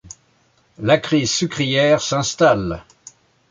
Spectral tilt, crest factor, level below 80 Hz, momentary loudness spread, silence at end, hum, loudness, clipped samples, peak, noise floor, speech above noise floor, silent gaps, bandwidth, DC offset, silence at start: -4 dB/octave; 18 dB; -48 dBFS; 9 LU; 0.7 s; none; -18 LUFS; under 0.1%; -2 dBFS; -59 dBFS; 42 dB; none; 9.6 kHz; under 0.1%; 0.05 s